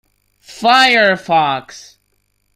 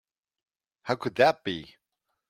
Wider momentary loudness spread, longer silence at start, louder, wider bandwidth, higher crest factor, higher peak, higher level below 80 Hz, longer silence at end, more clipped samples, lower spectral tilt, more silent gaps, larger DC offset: second, 10 LU vs 15 LU; second, 0.5 s vs 0.85 s; first, -12 LUFS vs -26 LUFS; about the same, 16 kHz vs 15 kHz; second, 16 dB vs 24 dB; first, 0 dBFS vs -6 dBFS; first, -60 dBFS vs -68 dBFS; about the same, 0.75 s vs 0.65 s; neither; second, -3 dB/octave vs -5.5 dB/octave; neither; neither